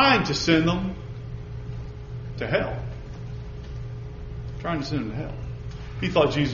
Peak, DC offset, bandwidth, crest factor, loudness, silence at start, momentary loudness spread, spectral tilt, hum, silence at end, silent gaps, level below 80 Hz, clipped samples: -6 dBFS; under 0.1%; 7.2 kHz; 20 dB; -27 LUFS; 0 s; 16 LU; -4 dB/octave; none; 0 s; none; -40 dBFS; under 0.1%